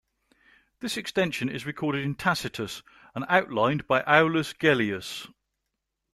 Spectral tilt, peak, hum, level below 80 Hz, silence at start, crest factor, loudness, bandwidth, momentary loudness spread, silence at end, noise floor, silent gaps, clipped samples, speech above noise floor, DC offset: -5 dB/octave; -4 dBFS; none; -62 dBFS; 0.8 s; 24 dB; -26 LUFS; 14.5 kHz; 16 LU; 0.85 s; -82 dBFS; none; under 0.1%; 56 dB; under 0.1%